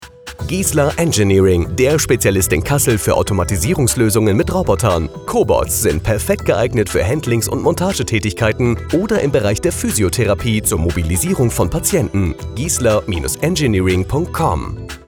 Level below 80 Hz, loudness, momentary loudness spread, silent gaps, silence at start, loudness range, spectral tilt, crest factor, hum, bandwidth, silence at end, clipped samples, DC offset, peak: -30 dBFS; -16 LUFS; 5 LU; none; 0 s; 2 LU; -5 dB/octave; 14 dB; none; 19.5 kHz; 0.1 s; under 0.1%; under 0.1%; -2 dBFS